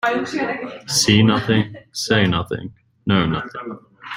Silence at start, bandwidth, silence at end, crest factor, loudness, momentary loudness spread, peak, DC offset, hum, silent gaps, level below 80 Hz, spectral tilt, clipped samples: 0.05 s; 16 kHz; 0 s; 18 dB; -19 LUFS; 17 LU; -2 dBFS; under 0.1%; none; none; -50 dBFS; -4.5 dB/octave; under 0.1%